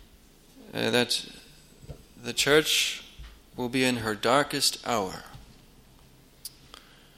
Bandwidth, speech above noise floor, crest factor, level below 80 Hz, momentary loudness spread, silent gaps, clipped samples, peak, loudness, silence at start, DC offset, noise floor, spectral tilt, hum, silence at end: 16.5 kHz; 29 dB; 24 dB; -54 dBFS; 23 LU; none; under 0.1%; -6 dBFS; -26 LUFS; 0 s; under 0.1%; -56 dBFS; -2.5 dB/octave; none; 0.7 s